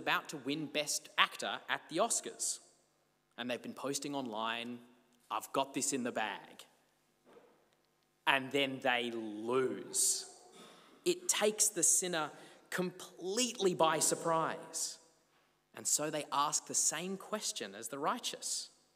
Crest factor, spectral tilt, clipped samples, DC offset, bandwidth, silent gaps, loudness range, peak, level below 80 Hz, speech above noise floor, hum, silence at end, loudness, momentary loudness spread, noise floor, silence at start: 26 dB; -1.5 dB/octave; under 0.1%; under 0.1%; 16 kHz; none; 7 LU; -12 dBFS; under -90 dBFS; 40 dB; 50 Hz at -80 dBFS; 0.3 s; -35 LUFS; 11 LU; -75 dBFS; 0 s